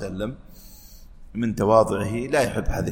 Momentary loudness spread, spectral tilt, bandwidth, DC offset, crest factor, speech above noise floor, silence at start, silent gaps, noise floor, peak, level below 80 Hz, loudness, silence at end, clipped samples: 15 LU; -6 dB/octave; 17 kHz; under 0.1%; 20 dB; 21 dB; 0 s; none; -44 dBFS; -4 dBFS; -36 dBFS; -23 LUFS; 0 s; under 0.1%